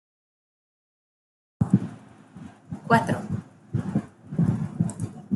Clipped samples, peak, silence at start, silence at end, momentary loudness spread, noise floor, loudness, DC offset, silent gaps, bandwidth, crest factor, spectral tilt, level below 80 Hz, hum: under 0.1%; -4 dBFS; 1.6 s; 0 s; 20 LU; -46 dBFS; -27 LUFS; under 0.1%; none; 12 kHz; 24 dB; -7.5 dB/octave; -56 dBFS; none